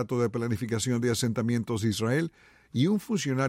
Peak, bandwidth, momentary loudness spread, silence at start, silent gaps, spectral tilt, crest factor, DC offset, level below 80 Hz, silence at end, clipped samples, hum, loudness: -14 dBFS; 16 kHz; 3 LU; 0 s; none; -5.5 dB/octave; 14 dB; under 0.1%; -62 dBFS; 0 s; under 0.1%; none; -28 LUFS